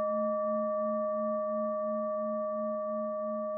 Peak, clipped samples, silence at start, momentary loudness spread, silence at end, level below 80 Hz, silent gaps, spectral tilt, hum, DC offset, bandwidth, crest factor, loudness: -22 dBFS; under 0.1%; 0 s; 3 LU; 0 s; under -90 dBFS; none; -4 dB/octave; none; under 0.1%; 1.9 kHz; 10 dB; -33 LUFS